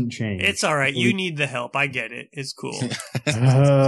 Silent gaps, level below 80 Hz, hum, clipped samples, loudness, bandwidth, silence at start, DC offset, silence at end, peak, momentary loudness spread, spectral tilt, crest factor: none; -58 dBFS; none; under 0.1%; -22 LUFS; 12.5 kHz; 0 s; under 0.1%; 0 s; -4 dBFS; 12 LU; -5 dB/octave; 16 dB